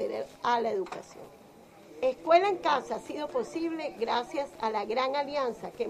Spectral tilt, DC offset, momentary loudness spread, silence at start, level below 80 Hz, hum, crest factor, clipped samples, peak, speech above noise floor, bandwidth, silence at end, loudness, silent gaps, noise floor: -4 dB/octave; under 0.1%; 12 LU; 0 s; -68 dBFS; none; 20 dB; under 0.1%; -10 dBFS; 24 dB; 14.5 kHz; 0 s; -30 LUFS; none; -53 dBFS